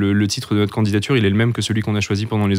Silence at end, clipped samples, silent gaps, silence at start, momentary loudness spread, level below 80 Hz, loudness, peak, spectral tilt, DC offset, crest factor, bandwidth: 0 s; under 0.1%; none; 0 s; 3 LU; -52 dBFS; -18 LUFS; -6 dBFS; -6 dB/octave; under 0.1%; 12 dB; 15 kHz